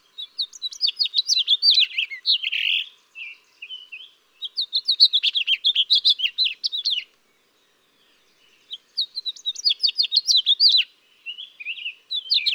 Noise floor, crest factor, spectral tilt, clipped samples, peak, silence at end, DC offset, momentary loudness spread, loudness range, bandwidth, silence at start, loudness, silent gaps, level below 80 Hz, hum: -63 dBFS; 20 dB; 6.5 dB/octave; under 0.1%; -4 dBFS; 0 s; under 0.1%; 22 LU; 7 LU; 19.5 kHz; 0.2 s; -19 LUFS; none; -90 dBFS; none